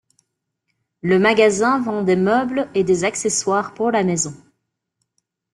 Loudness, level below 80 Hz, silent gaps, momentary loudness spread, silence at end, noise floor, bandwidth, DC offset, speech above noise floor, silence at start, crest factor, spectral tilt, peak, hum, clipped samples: -18 LUFS; -60 dBFS; none; 6 LU; 1.15 s; -75 dBFS; 11.5 kHz; under 0.1%; 58 dB; 1.05 s; 18 dB; -4.5 dB/octave; -2 dBFS; none; under 0.1%